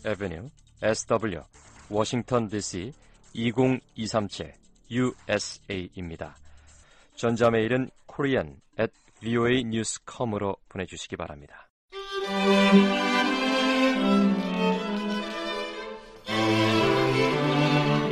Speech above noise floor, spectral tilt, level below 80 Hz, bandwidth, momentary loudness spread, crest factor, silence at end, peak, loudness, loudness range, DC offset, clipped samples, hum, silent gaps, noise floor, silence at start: 28 dB; -5 dB/octave; -54 dBFS; 13.5 kHz; 16 LU; 20 dB; 0 s; -6 dBFS; -26 LUFS; 7 LU; under 0.1%; under 0.1%; none; 11.70-11.88 s; -55 dBFS; 0.05 s